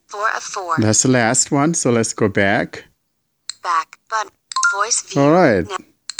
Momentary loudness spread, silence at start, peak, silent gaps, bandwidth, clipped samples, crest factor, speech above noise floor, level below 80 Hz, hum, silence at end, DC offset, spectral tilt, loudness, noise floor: 14 LU; 0.1 s; -2 dBFS; none; over 20 kHz; under 0.1%; 16 dB; 53 dB; -54 dBFS; none; 0.4 s; under 0.1%; -4 dB/octave; -17 LUFS; -70 dBFS